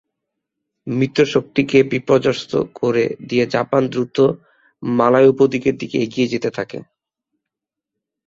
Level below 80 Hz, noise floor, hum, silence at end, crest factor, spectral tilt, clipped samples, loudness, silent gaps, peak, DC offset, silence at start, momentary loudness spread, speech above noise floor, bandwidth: -56 dBFS; -84 dBFS; none; 1.45 s; 18 dB; -6.5 dB/octave; under 0.1%; -17 LUFS; none; 0 dBFS; under 0.1%; 0.85 s; 12 LU; 67 dB; 7.6 kHz